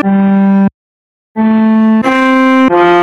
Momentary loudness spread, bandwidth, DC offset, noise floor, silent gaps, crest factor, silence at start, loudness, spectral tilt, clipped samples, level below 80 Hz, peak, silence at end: 6 LU; 8 kHz; under 0.1%; under -90 dBFS; 0.74-1.35 s; 8 dB; 0 s; -9 LUFS; -7.5 dB/octave; 0.6%; -50 dBFS; 0 dBFS; 0 s